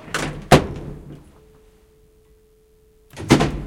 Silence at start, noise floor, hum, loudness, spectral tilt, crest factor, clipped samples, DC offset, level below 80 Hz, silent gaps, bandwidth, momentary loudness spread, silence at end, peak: 0.05 s; -55 dBFS; none; -18 LUFS; -5.5 dB/octave; 22 dB; under 0.1%; under 0.1%; -36 dBFS; none; 17 kHz; 25 LU; 0 s; 0 dBFS